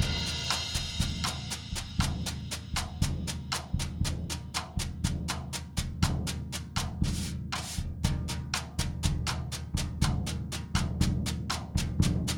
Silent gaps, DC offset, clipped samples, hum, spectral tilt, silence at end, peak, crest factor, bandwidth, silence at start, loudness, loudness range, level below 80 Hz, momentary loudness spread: none; under 0.1%; under 0.1%; none; -4 dB/octave; 0 s; -10 dBFS; 22 dB; 18 kHz; 0 s; -32 LUFS; 2 LU; -38 dBFS; 6 LU